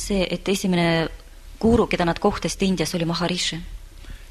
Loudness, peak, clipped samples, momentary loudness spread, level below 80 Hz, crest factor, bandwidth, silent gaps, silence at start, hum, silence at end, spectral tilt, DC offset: -22 LUFS; -6 dBFS; under 0.1%; 8 LU; -38 dBFS; 18 dB; 13.5 kHz; none; 0 s; none; 0 s; -5 dB/octave; under 0.1%